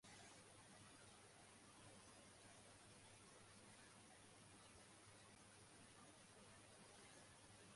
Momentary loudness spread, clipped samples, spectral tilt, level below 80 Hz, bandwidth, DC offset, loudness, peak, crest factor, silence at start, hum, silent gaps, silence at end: 2 LU; under 0.1%; -3 dB/octave; -84 dBFS; 11.5 kHz; under 0.1%; -65 LUFS; -52 dBFS; 14 dB; 0 s; none; none; 0 s